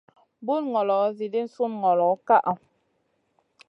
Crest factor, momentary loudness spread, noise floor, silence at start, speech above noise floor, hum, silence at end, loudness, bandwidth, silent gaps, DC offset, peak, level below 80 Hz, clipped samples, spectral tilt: 18 dB; 9 LU; -71 dBFS; 0.4 s; 48 dB; none; 1.1 s; -24 LUFS; 6.2 kHz; none; under 0.1%; -6 dBFS; -80 dBFS; under 0.1%; -8 dB/octave